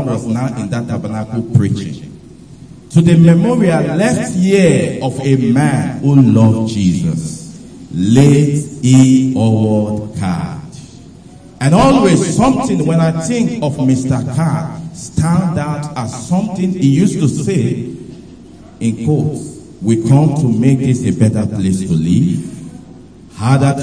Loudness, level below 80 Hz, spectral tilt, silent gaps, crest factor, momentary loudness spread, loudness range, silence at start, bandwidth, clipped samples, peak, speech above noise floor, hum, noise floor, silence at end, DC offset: -13 LUFS; -40 dBFS; -7 dB/octave; none; 12 dB; 14 LU; 4 LU; 0 s; 10.5 kHz; 0.1%; 0 dBFS; 25 dB; none; -37 dBFS; 0 s; 0.2%